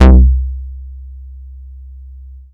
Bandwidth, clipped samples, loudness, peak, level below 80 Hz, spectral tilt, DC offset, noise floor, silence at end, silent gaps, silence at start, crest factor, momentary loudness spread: 4.3 kHz; under 0.1%; -13 LUFS; 0 dBFS; -14 dBFS; -9 dB/octave; under 0.1%; -33 dBFS; 1.4 s; none; 0 s; 12 dB; 25 LU